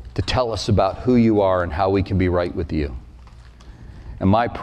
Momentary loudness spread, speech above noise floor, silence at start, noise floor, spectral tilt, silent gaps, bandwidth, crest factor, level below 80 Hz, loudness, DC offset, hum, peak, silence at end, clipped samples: 11 LU; 24 dB; 0 s; -42 dBFS; -7 dB/octave; none; 9.4 kHz; 14 dB; -36 dBFS; -20 LUFS; under 0.1%; none; -6 dBFS; 0 s; under 0.1%